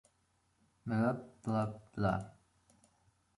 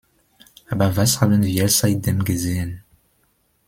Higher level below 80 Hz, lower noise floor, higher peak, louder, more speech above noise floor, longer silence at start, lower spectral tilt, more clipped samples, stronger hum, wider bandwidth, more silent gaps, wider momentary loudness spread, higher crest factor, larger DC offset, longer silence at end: second, -62 dBFS vs -48 dBFS; first, -76 dBFS vs -64 dBFS; second, -20 dBFS vs -2 dBFS; second, -37 LUFS vs -19 LUFS; second, 40 dB vs 46 dB; first, 0.85 s vs 0.7 s; first, -8.5 dB/octave vs -4.5 dB/octave; neither; neither; second, 11.5 kHz vs 16.5 kHz; neither; about the same, 10 LU vs 12 LU; about the same, 20 dB vs 18 dB; neither; first, 1.1 s vs 0.9 s